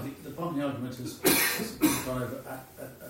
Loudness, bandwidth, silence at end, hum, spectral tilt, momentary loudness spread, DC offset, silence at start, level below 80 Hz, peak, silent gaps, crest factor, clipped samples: -28 LUFS; 16.5 kHz; 0 s; none; -3.5 dB/octave; 17 LU; under 0.1%; 0 s; -58 dBFS; -10 dBFS; none; 22 dB; under 0.1%